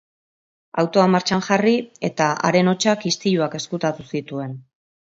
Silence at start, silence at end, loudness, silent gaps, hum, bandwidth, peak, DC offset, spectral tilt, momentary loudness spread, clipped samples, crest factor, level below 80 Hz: 0.75 s; 0.55 s; -20 LUFS; none; none; 7.8 kHz; -2 dBFS; under 0.1%; -5 dB/octave; 12 LU; under 0.1%; 20 dB; -62 dBFS